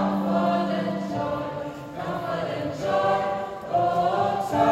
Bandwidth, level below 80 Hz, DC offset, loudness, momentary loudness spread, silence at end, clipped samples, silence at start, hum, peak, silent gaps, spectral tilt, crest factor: 15.5 kHz; -56 dBFS; under 0.1%; -26 LUFS; 9 LU; 0 s; under 0.1%; 0 s; none; -8 dBFS; none; -7 dB/octave; 16 dB